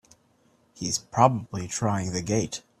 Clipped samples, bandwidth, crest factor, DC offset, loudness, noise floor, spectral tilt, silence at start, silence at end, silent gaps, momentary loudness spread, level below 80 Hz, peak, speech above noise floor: under 0.1%; 14.5 kHz; 24 dB; under 0.1%; -26 LUFS; -64 dBFS; -4.5 dB/octave; 0.75 s; 0.2 s; none; 10 LU; -58 dBFS; -4 dBFS; 38 dB